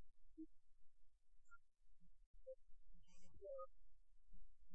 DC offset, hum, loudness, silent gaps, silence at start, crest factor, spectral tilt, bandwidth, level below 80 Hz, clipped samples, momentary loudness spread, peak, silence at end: under 0.1%; none; -61 LUFS; 2.26-2.34 s; 0 s; 10 dB; -7 dB/octave; 7.6 kHz; -70 dBFS; under 0.1%; 9 LU; -42 dBFS; 0 s